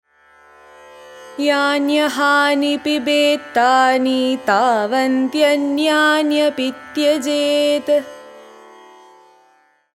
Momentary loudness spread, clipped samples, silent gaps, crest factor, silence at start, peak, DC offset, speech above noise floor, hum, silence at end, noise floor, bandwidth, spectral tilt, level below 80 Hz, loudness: 5 LU; under 0.1%; none; 16 dB; 1 s; -2 dBFS; under 0.1%; 40 dB; none; 1.55 s; -56 dBFS; 16 kHz; -2.5 dB/octave; -66 dBFS; -16 LUFS